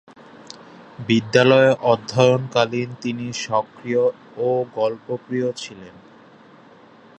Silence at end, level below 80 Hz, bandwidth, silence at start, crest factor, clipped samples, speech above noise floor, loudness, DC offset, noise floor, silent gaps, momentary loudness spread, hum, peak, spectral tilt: 1.3 s; -64 dBFS; 8.8 kHz; 0.4 s; 20 dB; under 0.1%; 28 dB; -20 LUFS; under 0.1%; -48 dBFS; none; 19 LU; none; 0 dBFS; -5.5 dB/octave